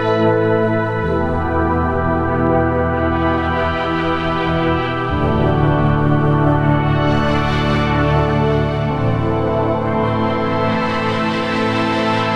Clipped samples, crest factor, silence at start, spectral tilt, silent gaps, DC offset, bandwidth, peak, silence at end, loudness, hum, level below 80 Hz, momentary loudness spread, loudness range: under 0.1%; 14 dB; 0 s; -8 dB/octave; none; under 0.1%; 8.8 kHz; -2 dBFS; 0 s; -17 LUFS; none; -30 dBFS; 3 LU; 2 LU